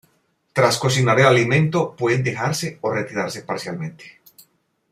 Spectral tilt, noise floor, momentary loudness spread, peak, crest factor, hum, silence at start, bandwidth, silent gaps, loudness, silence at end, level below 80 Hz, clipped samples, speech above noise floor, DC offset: -5 dB/octave; -65 dBFS; 13 LU; -2 dBFS; 18 dB; none; 0.55 s; 15.5 kHz; none; -19 LUFS; 0.8 s; -58 dBFS; under 0.1%; 46 dB; under 0.1%